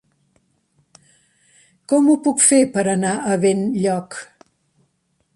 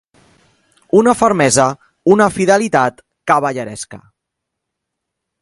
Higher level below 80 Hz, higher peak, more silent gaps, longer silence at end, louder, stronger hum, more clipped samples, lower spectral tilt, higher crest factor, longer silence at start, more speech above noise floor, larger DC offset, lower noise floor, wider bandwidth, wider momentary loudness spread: second, -64 dBFS vs -52 dBFS; about the same, -2 dBFS vs 0 dBFS; neither; second, 1.1 s vs 1.45 s; second, -17 LUFS vs -14 LUFS; neither; neither; about the same, -4.5 dB/octave vs -4.5 dB/octave; about the same, 20 dB vs 16 dB; first, 1.9 s vs 0.95 s; second, 50 dB vs 65 dB; neither; second, -67 dBFS vs -78 dBFS; about the same, 11.5 kHz vs 11.5 kHz; second, 11 LU vs 15 LU